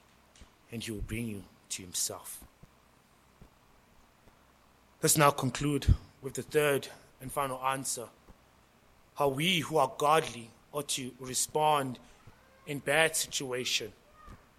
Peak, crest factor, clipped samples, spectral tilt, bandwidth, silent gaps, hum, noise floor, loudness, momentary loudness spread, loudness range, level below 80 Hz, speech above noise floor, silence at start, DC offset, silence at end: -8 dBFS; 26 dB; under 0.1%; -3.5 dB/octave; 16 kHz; none; none; -63 dBFS; -31 LUFS; 19 LU; 10 LU; -48 dBFS; 32 dB; 0.4 s; under 0.1%; 0.25 s